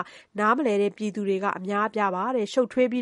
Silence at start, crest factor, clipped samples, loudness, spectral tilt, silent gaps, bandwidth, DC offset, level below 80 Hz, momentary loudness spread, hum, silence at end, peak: 0 s; 16 dB; under 0.1%; -25 LUFS; -6 dB/octave; none; 11 kHz; under 0.1%; -74 dBFS; 4 LU; none; 0 s; -8 dBFS